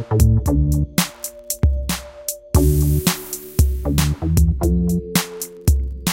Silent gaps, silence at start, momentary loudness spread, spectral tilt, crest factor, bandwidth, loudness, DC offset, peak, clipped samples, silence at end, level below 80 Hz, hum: none; 0 s; 9 LU; -5.5 dB/octave; 16 dB; 17 kHz; -19 LUFS; under 0.1%; -2 dBFS; under 0.1%; 0 s; -22 dBFS; none